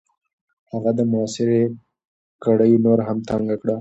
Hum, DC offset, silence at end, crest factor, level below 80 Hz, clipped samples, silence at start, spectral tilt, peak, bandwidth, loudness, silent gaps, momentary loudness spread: none; under 0.1%; 0 s; 16 dB; -56 dBFS; under 0.1%; 0.75 s; -7.5 dB/octave; -4 dBFS; 8.2 kHz; -20 LUFS; 2.07-2.39 s; 10 LU